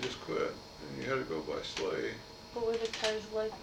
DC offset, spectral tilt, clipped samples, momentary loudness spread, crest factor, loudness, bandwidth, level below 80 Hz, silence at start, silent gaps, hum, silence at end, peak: under 0.1%; -3.5 dB/octave; under 0.1%; 10 LU; 18 dB; -36 LUFS; 16 kHz; -60 dBFS; 0 s; none; none; 0 s; -18 dBFS